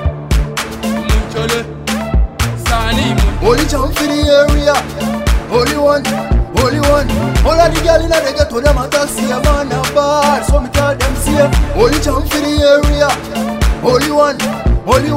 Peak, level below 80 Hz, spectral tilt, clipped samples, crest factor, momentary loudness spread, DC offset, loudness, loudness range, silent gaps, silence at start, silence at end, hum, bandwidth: 0 dBFS; -18 dBFS; -5 dB/octave; under 0.1%; 12 dB; 6 LU; under 0.1%; -13 LUFS; 2 LU; none; 0 s; 0 s; none; 16.5 kHz